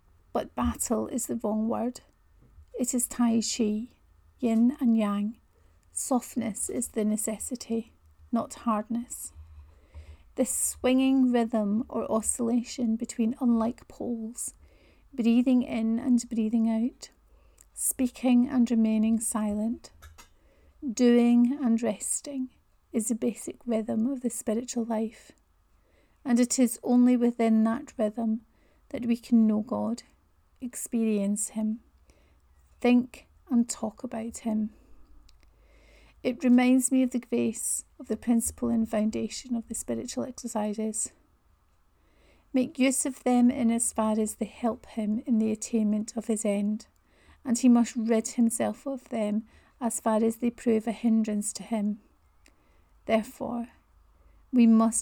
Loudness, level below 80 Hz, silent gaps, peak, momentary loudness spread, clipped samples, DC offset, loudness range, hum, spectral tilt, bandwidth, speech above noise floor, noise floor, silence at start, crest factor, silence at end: -27 LUFS; -58 dBFS; none; -12 dBFS; 12 LU; under 0.1%; under 0.1%; 5 LU; none; -4.5 dB/octave; 18 kHz; 38 dB; -65 dBFS; 0.35 s; 16 dB; 0 s